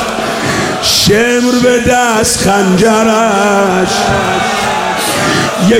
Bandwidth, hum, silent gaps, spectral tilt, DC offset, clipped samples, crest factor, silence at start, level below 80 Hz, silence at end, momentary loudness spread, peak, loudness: 17 kHz; none; none; -3.5 dB/octave; under 0.1%; under 0.1%; 10 dB; 0 s; -34 dBFS; 0 s; 4 LU; 0 dBFS; -10 LUFS